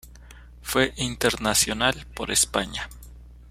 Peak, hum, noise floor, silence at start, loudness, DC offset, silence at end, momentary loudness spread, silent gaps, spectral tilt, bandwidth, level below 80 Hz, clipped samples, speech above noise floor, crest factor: -4 dBFS; 60 Hz at -40 dBFS; -46 dBFS; 0.05 s; -23 LUFS; under 0.1%; 0 s; 12 LU; none; -2 dB/octave; 16 kHz; -44 dBFS; under 0.1%; 21 dB; 22 dB